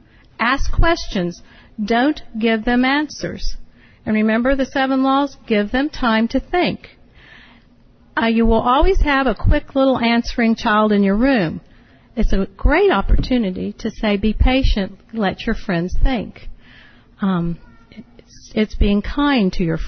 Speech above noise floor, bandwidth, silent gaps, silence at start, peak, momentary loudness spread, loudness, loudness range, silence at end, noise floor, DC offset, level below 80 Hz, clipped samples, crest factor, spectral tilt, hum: 33 dB; 6.6 kHz; none; 0.4 s; -4 dBFS; 11 LU; -18 LUFS; 6 LU; 0 s; -49 dBFS; under 0.1%; -26 dBFS; under 0.1%; 14 dB; -6.5 dB/octave; none